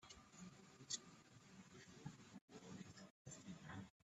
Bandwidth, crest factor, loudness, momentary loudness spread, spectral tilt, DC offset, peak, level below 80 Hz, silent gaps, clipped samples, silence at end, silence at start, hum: 12 kHz; 26 dB; -57 LUFS; 14 LU; -3 dB/octave; under 0.1%; -32 dBFS; -82 dBFS; 2.41-2.48 s, 3.10-3.25 s; under 0.1%; 0.2 s; 0 s; none